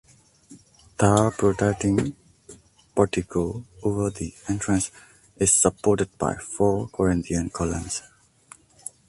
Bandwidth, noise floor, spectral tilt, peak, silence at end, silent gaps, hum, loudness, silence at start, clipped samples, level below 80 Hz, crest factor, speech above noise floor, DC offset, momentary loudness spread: 12 kHz; -52 dBFS; -5 dB/octave; -2 dBFS; 1.1 s; none; none; -24 LUFS; 0.5 s; under 0.1%; -44 dBFS; 22 dB; 29 dB; under 0.1%; 12 LU